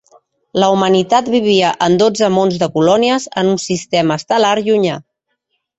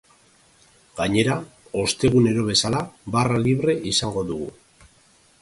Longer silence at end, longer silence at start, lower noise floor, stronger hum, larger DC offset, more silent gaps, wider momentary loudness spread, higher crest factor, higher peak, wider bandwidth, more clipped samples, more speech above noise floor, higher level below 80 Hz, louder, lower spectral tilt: about the same, 0.8 s vs 0.9 s; second, 0.55 s vs 0.95 s; first, -69 dBFS vs -57 dBFS; neither; neither; neither; second, 4 LU vs 11 LU; about the same, 14 dB vs 18 dB; first, 0 dBFS vs -4 dBFS; second, 8.4 kHz vs 11.5 kHz; neither; first, 56 dB vs 36 dB; second, -54 dBFS vs -48 dBFS; first, -14 LUFS vs -22 LUFS; about the same, -5 dB/octave vs -5 dB/octave